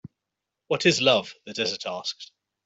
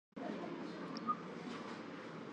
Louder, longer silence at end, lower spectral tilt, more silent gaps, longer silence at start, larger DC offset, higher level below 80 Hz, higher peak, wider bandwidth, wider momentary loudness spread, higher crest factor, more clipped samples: first, -24 LUFS vs -45 LUFS; first, 0.4 s vs 0 s; second, -3.5 dB/octave vs -6 dB/octave; neither; first, 0.7 s vs 0.15 s; neither; first, -70 dBFS vs -84 dBFS; first, -4 dBFS vs -28 dBFS; second, 8.2 kHz vs 10 kHz; first, 14 LU vs 7 LU; about the same, 22 dB vs 18 dB; neither